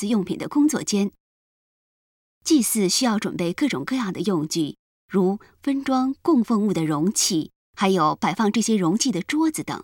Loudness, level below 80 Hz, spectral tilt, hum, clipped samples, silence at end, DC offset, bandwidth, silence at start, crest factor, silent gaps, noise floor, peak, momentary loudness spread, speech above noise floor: -22 LUFS; -62 dBFS; -4.5 dB/octave; none; under 0.1%; 0 s; under 0.1%; 17.5 kHz; 0 s; 16 dB; 1.20-2.41 s, 4.79-5.08 s, 7.56-7.74 s; under -90 dBFS; -8 dBFS; 7 LU; over 68 dB